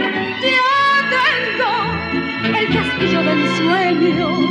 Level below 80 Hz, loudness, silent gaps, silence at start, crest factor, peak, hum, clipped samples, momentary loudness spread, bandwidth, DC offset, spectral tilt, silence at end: -46 dBFS; -16 LUFS; none; 0 s; 14 dB; -2 dBFS; none; under 0.1%; 6 LU; 10.5 kHz; under 0.1%; -5.5 dB/octave; 0 s